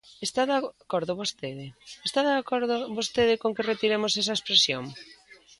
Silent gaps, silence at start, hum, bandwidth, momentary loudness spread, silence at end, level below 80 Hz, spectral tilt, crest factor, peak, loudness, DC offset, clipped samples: none; 0.1 s; none; 11.5 kHz; 16 LU; 0.25 s; -64 dBFS; -3 dB/octave; 22 dB; -6 dBFS; -26 LUFS; under 0.1%; under 0.1%